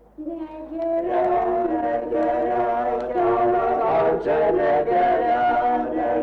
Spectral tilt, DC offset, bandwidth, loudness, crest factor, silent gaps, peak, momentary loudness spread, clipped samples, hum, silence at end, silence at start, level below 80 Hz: -8 dB/octave; under 0.1%; 5.6 kHz; -21 LUFS; 10 dB; none; -12 dBFS; 7 LU; under 0.1%; none; 0 s; 0.2 s; -48 dBFS